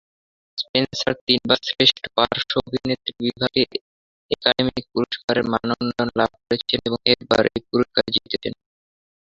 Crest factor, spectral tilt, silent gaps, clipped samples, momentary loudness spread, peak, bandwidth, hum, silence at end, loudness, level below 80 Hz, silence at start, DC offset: 22 dB; -5 dB/octave; 0.69-0.74 s, 1.21-1.27 s, 3.81-4.29 s, 5.24-5.28 s; under 0.1%; 8 LU; 0 dBFS; 7.6 kHz; none; 0.75 s; -21 LUFS; -52 dBFS; 0.55 s; under 0.1%